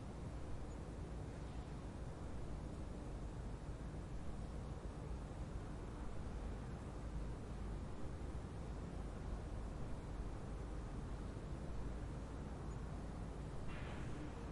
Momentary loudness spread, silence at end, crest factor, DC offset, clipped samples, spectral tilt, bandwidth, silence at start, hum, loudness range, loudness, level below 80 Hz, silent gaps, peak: 2 LU; 0 s; 12 dB; under 0.1%; under 0.1%; -7 dB/octave; 11.5 kHz; 0 s; none; 1 LU; -50 LUFS; -50 dBFS; none; -34 dBFS